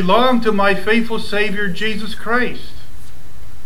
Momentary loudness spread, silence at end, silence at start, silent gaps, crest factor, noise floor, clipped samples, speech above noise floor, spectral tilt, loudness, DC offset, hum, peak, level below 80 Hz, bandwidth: 11 LU; 0.05 s; 0 s; none; 16 dB; -40 dBFS; under 0.1%; 22 dB; -5.5 dB/octave; -17 LUFS; 20%; none; 0 dBFS; -42 dBFS; 19 kHz